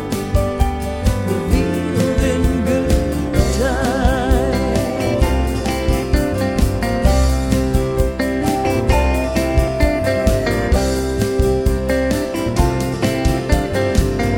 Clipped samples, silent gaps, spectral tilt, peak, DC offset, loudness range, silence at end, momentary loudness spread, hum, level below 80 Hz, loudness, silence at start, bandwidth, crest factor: under 0.1%; none; -6 dB/octave; -2 dBFS; under 0.1%; 1 LU; 0 s; 3 LU; none; -20 dBFS; -18 LUFS; 0 s; 17.5 kHz; 14 dB